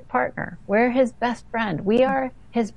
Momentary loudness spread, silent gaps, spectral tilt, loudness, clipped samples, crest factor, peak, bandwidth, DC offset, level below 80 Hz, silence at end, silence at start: 8 LU; none; -6.5 dB/octave; -23 LUFS; under 0.1%; 14 dB; -8 dBFS; 10.5 kHz; 0.5%; -50 dBFS; 0.05 s; 0.1 s